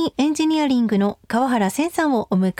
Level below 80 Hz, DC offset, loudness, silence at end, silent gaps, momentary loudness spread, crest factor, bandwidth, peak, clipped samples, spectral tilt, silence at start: -58 dBFS; under 0.1%; -20 LUFS; 0.1 s; none; 3 LU; 12 dB; 16.5 kHz; -8 dBFS; under 0.1%; -5.5 dB/octave; 0 s